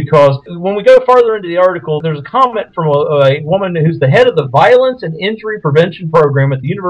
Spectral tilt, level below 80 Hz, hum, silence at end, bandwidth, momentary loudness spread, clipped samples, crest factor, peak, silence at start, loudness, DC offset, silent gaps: -7.5 dB/octave; -50 dBFS; none; 0 s; 8.8 kHz; 9 LU; 2%; 10 dB; 0 dBFS; 0 s; -11 LUFS; under 0.1%; none